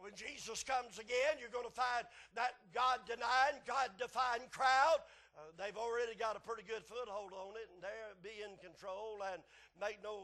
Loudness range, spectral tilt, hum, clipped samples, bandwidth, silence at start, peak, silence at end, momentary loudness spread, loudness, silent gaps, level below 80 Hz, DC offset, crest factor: 11 LU; -1 dB/octave; none; under 0.1%; 12.5 kHz; 0 s; -20 dBFS; 0 s; 16 LU; -39 LUFS; none; -74 dBFS; under 0.1%; 20 dB